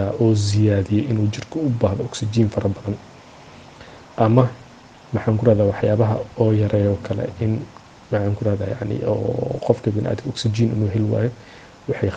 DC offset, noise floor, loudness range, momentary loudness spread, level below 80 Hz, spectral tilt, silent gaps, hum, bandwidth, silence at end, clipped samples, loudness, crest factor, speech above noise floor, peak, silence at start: under 0.1%; -44 dBFS; 3 LU; 10 LU; -48 dBFS; -7.5 dB/octave; none; none; 9 kHz; 0 s; under 0.1%; -21 LUFS; 20 dB; 25 dB; 0 dBFS; 0 s